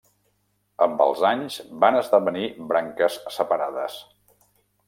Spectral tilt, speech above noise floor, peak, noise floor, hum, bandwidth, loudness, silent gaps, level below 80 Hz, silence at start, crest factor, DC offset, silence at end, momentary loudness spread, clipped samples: -4.5 dB/octave; 47 dB; -4 dBFS; -70 dBFS; 50 Hz at -60 dBFS; 16.5 kHz; -23 LUFS; none; -72 dBFS; 0.8 s; 20 dB; under 0.1%; 0.85 s; 11 LU; under 0.1%